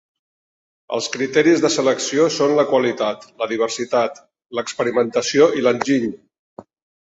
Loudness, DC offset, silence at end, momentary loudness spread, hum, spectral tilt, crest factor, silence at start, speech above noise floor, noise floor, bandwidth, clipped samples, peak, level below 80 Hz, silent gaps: -19 LUFS; under 0.1%; 0.95 s; 11 LU; none; -4 dB/octave; 18 dB; 0.9 s; over 72 dB; under -90 dBFS; 8 kHz; under 0.1%; -2 dBFS; -64 dBFS; none